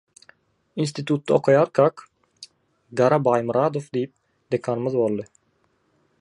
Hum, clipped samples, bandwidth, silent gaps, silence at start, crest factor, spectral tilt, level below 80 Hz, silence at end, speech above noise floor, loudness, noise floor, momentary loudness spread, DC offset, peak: none; under 0.1%; 11 kHz; none; 0.75 s; 20 dB; -7 dB/octave; -68 dBFS; 0.95 s; 46 dB; -22 LUFS; -67 dBFS; 13 LU; under 0.1%; -4 dBFS